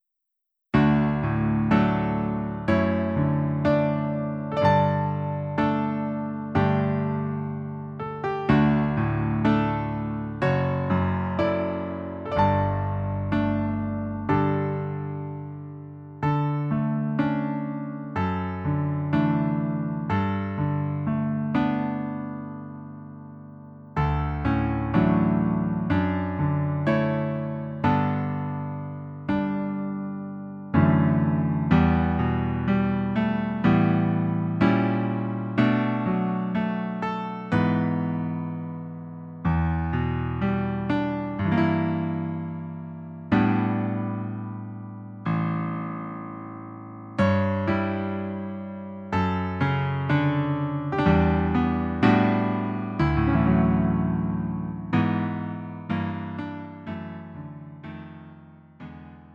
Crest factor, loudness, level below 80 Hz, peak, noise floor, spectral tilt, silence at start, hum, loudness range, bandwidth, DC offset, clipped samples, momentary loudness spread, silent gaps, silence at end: 20 dB; -25 LUFS; -42 dBFS; -6 dBFS; -81 dBFS; -9.5 dB/octave; 0.75 s; none; 5 LU; 6.2 kHz; under 0.1%; under 0.1%; 15 LU; none; 0 s